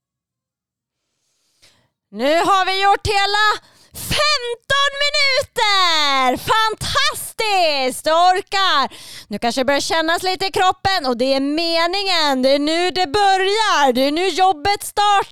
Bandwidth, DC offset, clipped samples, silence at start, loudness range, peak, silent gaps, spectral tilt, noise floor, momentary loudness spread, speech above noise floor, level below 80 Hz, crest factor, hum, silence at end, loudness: 19 kHz; 2%; under 0.1%; 0 s; 2 LU; -2 dBFS; none; -2.5 dB/octave; -85 dBFS; 5 LU; 68 dB; -46 dBFS; 14 dB; none; 0 s; -16 LUFS